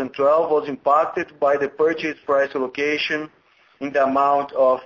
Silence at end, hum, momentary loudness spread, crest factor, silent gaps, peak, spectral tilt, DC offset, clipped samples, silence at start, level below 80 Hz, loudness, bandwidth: 0 s; none; 7 LU; 16 dB; none; -4 dBFS; -5 dB/octave; under 0.1%; under 0.1%; 0 s; -64 dBFS; -20 LUFS; 7.2 kHz